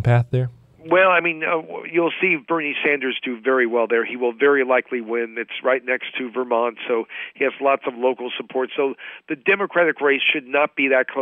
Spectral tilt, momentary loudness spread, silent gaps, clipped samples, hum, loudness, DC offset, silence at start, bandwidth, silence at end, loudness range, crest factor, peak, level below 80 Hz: -8.5 dB/octave; 8 LU; none; under 0.1%; none; -20 LUFS; under 0.1%; 0 s; 4.2 kHz; 0 s; 3 LU; 14 dB; -6 dBFS; -58 dBFS